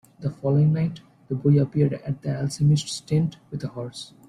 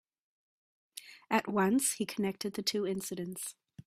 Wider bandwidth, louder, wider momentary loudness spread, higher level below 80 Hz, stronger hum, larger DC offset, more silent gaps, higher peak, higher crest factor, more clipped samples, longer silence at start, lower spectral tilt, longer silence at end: second, 11 kHz vs 16 kHz; first, -24 LUFS vs -33 LUFS; second, 13 LU vs 20 LU; first, -56 dBFS vs -76 dBFS; neither; neither; neither; first, -8 dBFS vs -12 dBFS; second, 16 dB vs 22 dB; neither; second, 0.2 s vs 0.95 s; first, -7 dB/octave vs -3.5 dB/octave; first, 0.2 s vs 0.05 s